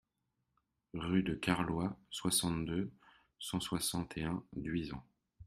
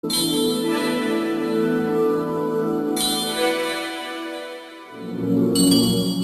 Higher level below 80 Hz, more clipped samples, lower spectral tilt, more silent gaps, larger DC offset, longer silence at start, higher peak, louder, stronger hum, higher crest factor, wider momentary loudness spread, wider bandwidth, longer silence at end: second, -60 dBFS vs -54 dBFS; neither; about the same, -4 dB/octave vs -4 dB/octave; neither; neither; first, 0.95 s vs 0.05 s; second, -16 dBFS vs -4 dBFS; second, -37 LUFS vs -21 LUFS; neither; about the same, 22 dB vs 18 dB; about the same, 12 LU vs 14 LU; about the same, 15 kHz vs 14.5 kHz; about the same, 0 s vs 0 s